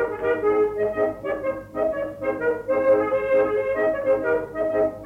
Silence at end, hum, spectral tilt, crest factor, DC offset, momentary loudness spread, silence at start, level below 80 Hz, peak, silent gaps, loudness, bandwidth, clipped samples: 0 s; none; -7.5 dB/octave; 12 dB; under 0.1%; 7 LU; 0 s; -52 dBFS; -10 dBFS; none; -23 LUFS; 4.8 kHz; under 0.1%